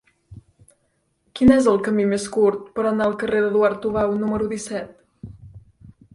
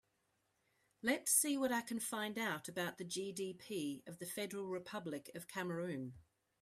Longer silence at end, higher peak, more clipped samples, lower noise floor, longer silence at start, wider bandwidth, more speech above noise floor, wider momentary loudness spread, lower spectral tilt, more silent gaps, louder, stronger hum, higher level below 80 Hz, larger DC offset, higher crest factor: first, 0.55 s vs 0.4 s; first, -2 dBFS vs -20 dBFS; neither; second, -68 dBFS vs -82 dBFS; second, 0.3 s vs 1.05 s; second, 11.5 kHz vs 15.5 kHz; first, 49 dB vs 41 dB; about the same, 15 LU vs 14 LU; first, -6 dB/octave vs -3 dB/octave; neither; first, -20 LUFS vs -40 LUFS; neither; first, -48 dBFS vs -80 dBFS; neither; about the same, 18 dB vs 22 dB